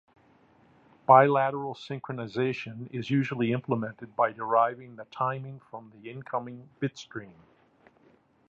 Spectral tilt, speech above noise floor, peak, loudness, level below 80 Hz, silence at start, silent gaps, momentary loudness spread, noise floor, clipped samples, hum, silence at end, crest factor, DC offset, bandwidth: -7.5 dB/octave; 35 dB; -4 dBFS; -28 LUFS; -72 dBFS; 1.1 s; none; 22 LU; -63 dBFS; under 0.1%; none; 1.2 s; 26 dB; under 0.1%; 7.6 kHz